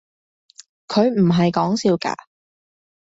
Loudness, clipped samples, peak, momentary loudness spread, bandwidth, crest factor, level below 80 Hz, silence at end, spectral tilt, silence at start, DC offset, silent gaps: -19 LUFS; under 0.1%; -4 dBFS; 9 LU; 8 kHz; 18 dB; -58 dBFS; 0.9 s; -6.5 dB/octave; 0.9 s; under 0.1%; none